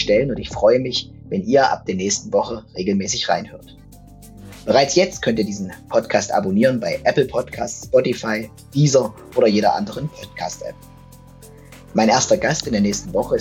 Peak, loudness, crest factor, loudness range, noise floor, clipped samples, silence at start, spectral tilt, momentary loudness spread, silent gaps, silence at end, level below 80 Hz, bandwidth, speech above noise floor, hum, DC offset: -2 dBFS; -19 LUFS; 18 dB; 2 LU; -43 dBFS; under 0.1%; 0 s; -4.5 dB/octave; 12 LU; none; 0 s; -46 dBFS; 16.5 kHz; 24 dB; none; under 0.1%